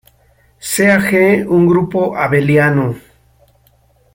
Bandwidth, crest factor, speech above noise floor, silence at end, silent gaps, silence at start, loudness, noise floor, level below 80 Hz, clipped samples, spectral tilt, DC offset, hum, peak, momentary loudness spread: 16.5 kHz; 14 dB; 41 dB; 1.15 s; none; 0.65 s; -13 LUFS; -53 dBFS; -48 dBFS; under 0.1%; -6 dB/octave; under 0.1%; none; 0 dBFS; 10 LU